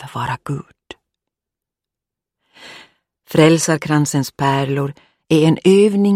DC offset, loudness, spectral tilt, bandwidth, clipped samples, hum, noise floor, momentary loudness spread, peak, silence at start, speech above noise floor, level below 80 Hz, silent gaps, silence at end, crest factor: under 0.1%; -16 LUFS; -5.5 dB/octave; 16 kHz; under 0.1%; none; -86 dBFS; 13 LU; 0 dBFS; 0 s; 71 dB; -56 dBFS; none; 0 s; 18 dB